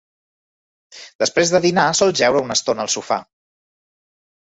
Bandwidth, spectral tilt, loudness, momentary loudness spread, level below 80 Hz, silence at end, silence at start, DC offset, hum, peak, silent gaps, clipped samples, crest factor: 8.4 kHz; -3 dB/octave; -17 LUFS; 7 LU; -58 dBFS; 1.3 s; 0.95 s; under 0.1%; none; -2 dBFS; 1.15-1.19 s; under 0.1%; 18 dB